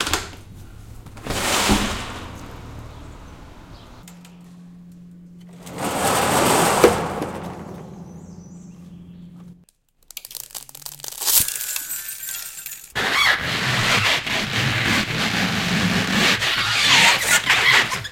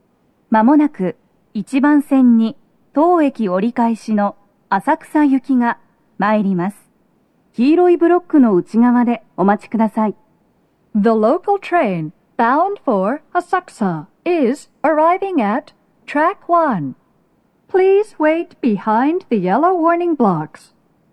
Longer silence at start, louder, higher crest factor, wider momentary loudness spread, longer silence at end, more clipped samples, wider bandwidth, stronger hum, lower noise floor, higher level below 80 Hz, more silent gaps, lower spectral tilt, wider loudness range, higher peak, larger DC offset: second, 0 s vs 0.5 s; about the same, -18 LUFS vs -16 LUFS; first, 22 dB vs 14 dB; first, 23 LU vs 9 LU; second, 0 s vs 0.65 s; neither; first, 17 kHz vs 11.5 kHz; neither; about the same, -57 dBFS vs -59 dBFS; first, -42 dBFS vs -66 dBFS; neither; second, -2.5 dB/octave vs -8 dB/octave; first, 20 LU vs 3 LU; about the same, 0 dBFS vs -2 dBFS; neither